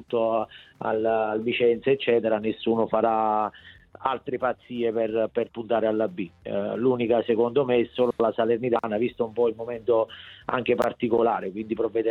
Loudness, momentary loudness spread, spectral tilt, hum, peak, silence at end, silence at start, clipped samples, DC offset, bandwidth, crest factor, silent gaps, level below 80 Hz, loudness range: -25 LUFS; 7 LU; -7.5 dB/octave; none; -8 dBFS; 0 s; 0 s; under 0.1%; under 0.1%; 6 kHz; 16 dB; none; -62 dBFS; 3 LU